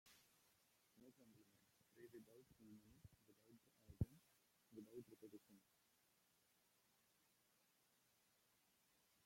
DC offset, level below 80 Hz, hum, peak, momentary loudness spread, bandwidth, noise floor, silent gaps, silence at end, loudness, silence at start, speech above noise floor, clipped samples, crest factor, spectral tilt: under 0.1%; -74 dBFS; none; -30 dBFS; 17 LU; 16.5 kHz; -82 dBFS; none; 0 s; -58 LUFS; 0.05 s; 17 dB; under 0.1%; 32 dB; -7 dB/octave